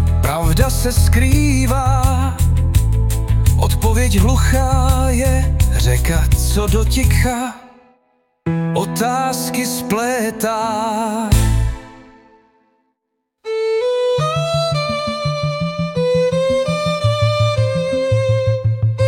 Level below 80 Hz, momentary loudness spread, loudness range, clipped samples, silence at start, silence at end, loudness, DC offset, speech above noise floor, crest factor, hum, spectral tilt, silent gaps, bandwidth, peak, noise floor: -22 dBFS; 6 LU; 5 LU; under 0.1%; 0 s; 0 s; -17 LUFS; under 0.1%; 60 dB; 14 dB; none; -5.5 dB/octave; none; 17 kHz; -2 dBFS; -74 dBFS